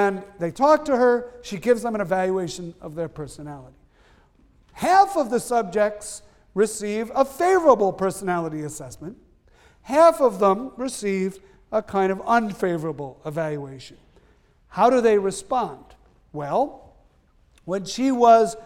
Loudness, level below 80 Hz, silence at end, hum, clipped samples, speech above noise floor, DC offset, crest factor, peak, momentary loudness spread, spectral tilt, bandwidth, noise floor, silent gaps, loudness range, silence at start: -22 LUFS; -56 dBFS; 0 s; none; under 0.1%; 37 dB; under 0.1%; 20 dB; -2 dBFS; 18 LU; -5 dB/octave; 17 kHz; -58 dBFS; none; 5 LU; 0 s